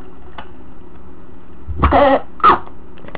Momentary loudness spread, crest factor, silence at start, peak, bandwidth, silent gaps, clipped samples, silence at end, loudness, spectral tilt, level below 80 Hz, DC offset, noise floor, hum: 24 LU; 16 dB; 0.4 s; 0 dBFS; 4 kHz; none; under 0.1%; 0 s; -14 LUFS; -10 dB/octave; -28 dBFS; 7%; -39 dBFS; none